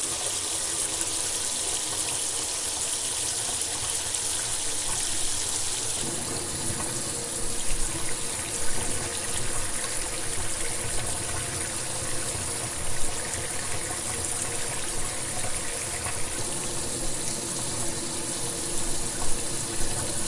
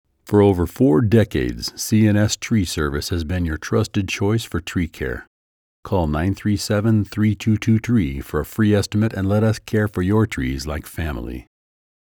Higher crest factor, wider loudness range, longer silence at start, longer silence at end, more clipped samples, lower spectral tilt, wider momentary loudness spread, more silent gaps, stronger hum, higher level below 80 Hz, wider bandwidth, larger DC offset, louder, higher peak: first, 22 dB vs 16 dB; about the same, 3 LU vs 4 LU; second, 0 s vs 0.25 s; second, 0 s vs 0.6 s; neither; second, -1.5 dB/octave vs -6 dB/octave; second, 3 LU vs 10 LU; second, none vs 5.27-5.83 s; neither; about the same, -40 dBFS vs -38 dBFS; second, 11.5 kHz vs over 20 kHz; neither; second, -27 LUFS vs -20 LUFS; about the same, -6 dBFS vs -4 dBFS